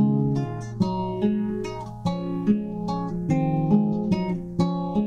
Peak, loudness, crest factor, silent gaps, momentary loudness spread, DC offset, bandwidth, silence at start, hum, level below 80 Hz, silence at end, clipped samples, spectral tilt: -8 dBFS; -25 LUFS; 16 dB; none; 7 LU; under 0.1%; 8.8 kHz; 0 s; none; -46 dBFS; 0 s; under 0.1%; -9 dB/octave